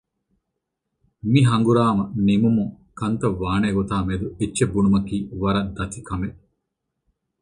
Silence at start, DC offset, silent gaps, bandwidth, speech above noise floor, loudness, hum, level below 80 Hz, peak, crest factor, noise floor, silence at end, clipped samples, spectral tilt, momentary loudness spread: 1.25 s; under 0.1%; none; 11 kHz; 59 dB; -21 LUFS; none; -42 dBFS; -4 dBFS; 18 dB; -80 dBFS; 1.1 s; under 0.1%; -7 dB/octave; 12 LU